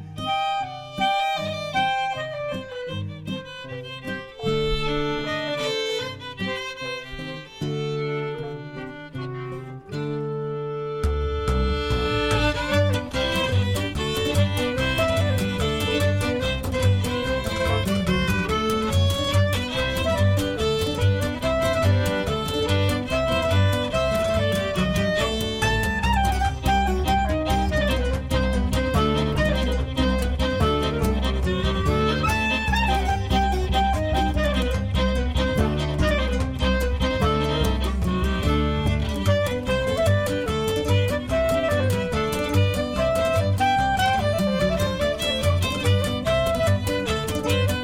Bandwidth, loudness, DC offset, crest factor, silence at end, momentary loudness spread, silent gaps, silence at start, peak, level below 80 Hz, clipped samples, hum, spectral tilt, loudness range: 16.5 kHz; -23 LUFS; under 0.1%; 14 dB; 0 s; 8 LU; none; 0 s; -8 dBFS; -30 dBFS; under 0.1%; none; -5.5 dB/octave; 6 LU